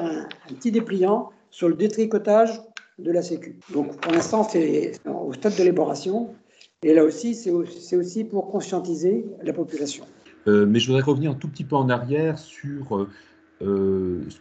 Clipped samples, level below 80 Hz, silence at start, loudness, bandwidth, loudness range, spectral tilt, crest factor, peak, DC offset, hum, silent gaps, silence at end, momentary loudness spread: under 0.1%; -64 dBFS; 0 s; -23 LUFS; 8.8 kHz; 2 LU; -6 dB/octave; 20 dB; -4 dBFS; under 0.1%; none; none; 0.05 s; 13 LU